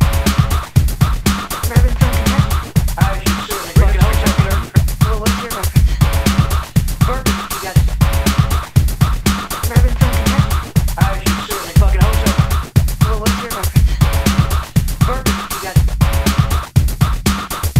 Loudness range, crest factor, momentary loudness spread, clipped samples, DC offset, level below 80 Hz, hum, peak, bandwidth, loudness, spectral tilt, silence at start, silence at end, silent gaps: 1 LU; 14 dB; 4 LU; under 0.1%; 0.8%; -18 dBFS; none; 0 dBFS; 16.5 kHz; -15 LUFS; -5.5 dB/octave; 0 s; 0 s; none